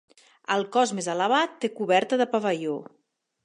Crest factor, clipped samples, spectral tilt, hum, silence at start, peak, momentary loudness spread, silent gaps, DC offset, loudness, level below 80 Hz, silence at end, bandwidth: 18 dB; under 0.1%; -4 dB/octave; none; 0.5 s; -8 dBFS; 8 LU; none; under 0.1%; -25 LUFS; -82 dBFS; 0.6 s; 11 kHz